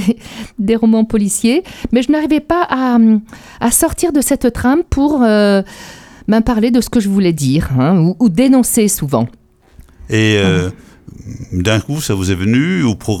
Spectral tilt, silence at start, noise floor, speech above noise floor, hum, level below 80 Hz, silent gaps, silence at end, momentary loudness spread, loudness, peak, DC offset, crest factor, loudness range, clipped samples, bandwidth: -5.5 dB/octave; 0 s; -43 dBFS; 30 dB; none; -34 dBFS; none; 0 s; 8 LU; -13 LUFS; 0 dBFS; under 0.1%; 14 dB; 3 LU; under 0.1%; 17 kHz